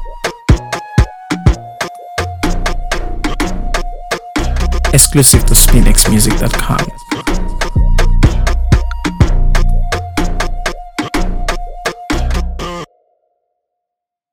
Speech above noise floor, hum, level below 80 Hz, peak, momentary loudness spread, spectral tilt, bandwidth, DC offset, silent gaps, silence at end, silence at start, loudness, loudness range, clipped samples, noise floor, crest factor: 73 dB; none; -14 dBFS; 0 dBFS; 14 LU; -4 dB/octave; over 20 kHz; under 0.1%; none; 1.45 s; 0 s; -14 LUFS; 10 LU; 0.5%; -80 dBFS; 12 dB